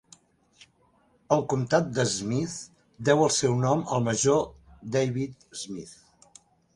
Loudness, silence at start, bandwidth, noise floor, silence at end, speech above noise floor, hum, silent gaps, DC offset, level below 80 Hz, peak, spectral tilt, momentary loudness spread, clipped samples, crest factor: -26 LUFS; 1.3 s; 11.5 kHz; -65 dBFS; 0.85 s; 39 dB; none; none; under 0.1%; -60 dBFS; -6 dBFS; -4.5 dB/octave; 16 LU; under 0.1%; 20 dB